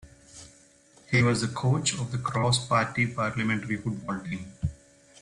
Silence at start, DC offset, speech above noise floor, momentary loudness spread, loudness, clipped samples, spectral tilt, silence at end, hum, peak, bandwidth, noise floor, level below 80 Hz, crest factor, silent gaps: 0.05 s; under 0.1%; 31 dB; 11 LU; -27 LUFS; under 0.1%; -4.5 dB/octave; 0.45 s; none; -10 dBFS; 11 kHz; -57 dBFS; -52 dBFS; 18 dB; none